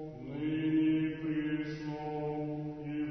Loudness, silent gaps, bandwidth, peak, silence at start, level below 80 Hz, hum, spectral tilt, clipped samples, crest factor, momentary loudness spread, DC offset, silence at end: -35 LUFS; none; 6.2 kHz; -22 dBFS; 0 s; -62 dBFS; none; -8.5 dB/octave; under 0.1%; 12 dB; 10 LU; under 0.1%; 0 s